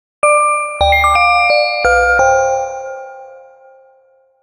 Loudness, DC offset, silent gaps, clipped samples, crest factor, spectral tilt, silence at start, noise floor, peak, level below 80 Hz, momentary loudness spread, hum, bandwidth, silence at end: -12 LUFS; under 0.1%; none; under 0.1%; 14 dB; -1.5 dB/octave; 0.25 s; -52 dBFS; 0 dBFS; -32 dBFS; 16 LU; none; 15.5 kHz; 1.05 s